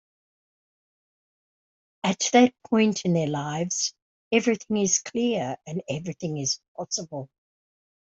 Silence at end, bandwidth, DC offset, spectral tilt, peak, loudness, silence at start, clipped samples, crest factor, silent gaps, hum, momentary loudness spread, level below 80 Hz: 0.75 s; 8.2 kHz; under 0.1%; -4 dB/octave; -6 dBFS; -25 LUFS; 2.05 s; under 0.1%; 22 dB; 4.02-4.31 s, 6.68-6.75 s; none; 11 LU; -68 dBFS